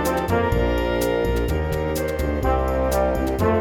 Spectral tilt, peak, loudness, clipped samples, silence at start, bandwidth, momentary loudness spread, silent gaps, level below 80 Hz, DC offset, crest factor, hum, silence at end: -6.5 dB/octave; -6 dBFS; -22 LUFS; under 0.1%; 0 s; over 20 kHz; 3 LU; none; -28 dBFS; under 0.1%; 14 dB; none; 0 s